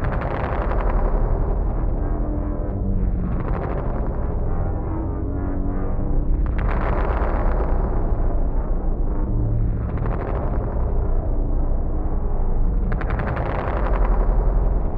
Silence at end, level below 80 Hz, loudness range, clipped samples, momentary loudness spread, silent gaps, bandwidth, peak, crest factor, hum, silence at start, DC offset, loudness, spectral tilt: 0 s; -20 dBFS; 1 LU; under 0.1%; 3 LU; none; 3.5 kHz; -8 dBFS; 12 dB; none; 0 s; under 0.1%; -25 LUFS; -11 dB/octave